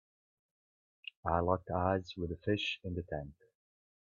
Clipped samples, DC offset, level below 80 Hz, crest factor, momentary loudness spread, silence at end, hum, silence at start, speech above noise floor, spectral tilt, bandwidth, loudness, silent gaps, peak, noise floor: under 0.1%; under 0.1%; -60 dBFS; 24 dB; 14 LU; 0.85 s; none; 1.25 s; over 55 dB; -4.5 dB/octave; 7.2 kHz; -36 LUFS; none; -14 dBFS; under -90 dBFS